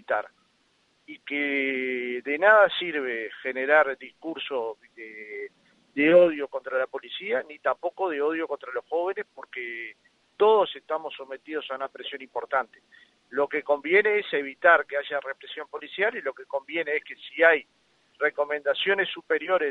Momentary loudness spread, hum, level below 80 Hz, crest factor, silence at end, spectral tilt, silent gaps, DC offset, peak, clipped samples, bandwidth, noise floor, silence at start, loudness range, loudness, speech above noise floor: 17 LU; none; -80 dBFS; 22 dB; 0 s; -5.5 dB/octave; none; under 0.1%; -4 dBFS; under 0.1%; 5.4 kHz; -67 dBFS; 0.1 s; 5 LU; -25 LUFS; 41 dB